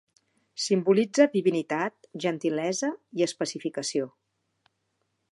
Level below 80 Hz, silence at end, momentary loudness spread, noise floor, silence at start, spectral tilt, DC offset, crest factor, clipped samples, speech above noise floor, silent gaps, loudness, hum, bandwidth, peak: -82 dBFS; 1.25 s; 10 LU; -77 dBFS; 0.55 s; -4.5 dB/octave; under 0.1%; 22 dB; under 0.1%; 51 dB; none; -27 LUFS; none; 11.5 kHz; -6 dBFS